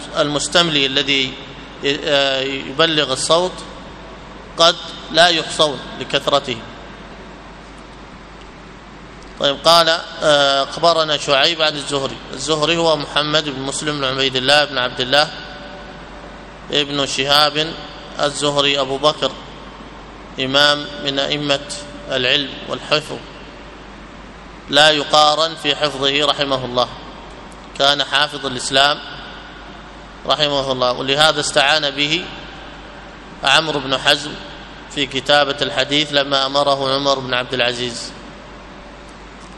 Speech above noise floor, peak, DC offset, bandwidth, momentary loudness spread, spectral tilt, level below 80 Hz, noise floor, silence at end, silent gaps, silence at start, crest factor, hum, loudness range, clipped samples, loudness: 20 dB; 0 dBFS; under 0.1%; 14.5 kHz; 23 LU; -2.5 dB/octave; -44 dBFS; -37 dBFS; 0 s; none; 0 s; 18 dB; none; 4 LU; under 0.1%; -16 LUFS